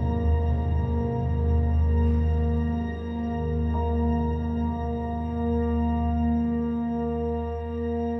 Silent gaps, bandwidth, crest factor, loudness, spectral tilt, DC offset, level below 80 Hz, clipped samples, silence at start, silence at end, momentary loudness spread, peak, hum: none; 4 kHz; 10 dB; -26 LUFS; -11 dB/octave; under 0.1%; -28 dBFS; under 0.1%; 0 s; 0 s; 6 LU; -14 dBFS; none